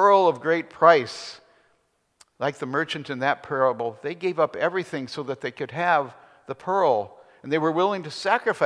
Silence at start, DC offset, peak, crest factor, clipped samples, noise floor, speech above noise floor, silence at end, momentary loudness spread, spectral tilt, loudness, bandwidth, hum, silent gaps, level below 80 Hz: 0 s; under 0.1%; -2 dBFS; 22 dB; under 0.1%; -68 dBFS; 45 dB; 0 s; 15 LU; -5.5 dB/octave; -24 LUFS; 11 kHz; none; none; -76 dBFS